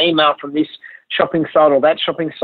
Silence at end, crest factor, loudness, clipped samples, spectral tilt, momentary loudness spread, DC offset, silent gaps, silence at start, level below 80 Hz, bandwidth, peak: 0 s; 14 dB; -16 LUFS; under 0.1%; -8.5 dB/octave; 9 LU; under 0.1%; none; 0 s; -60 dBFS; 4.7 kHz; -2 dBFS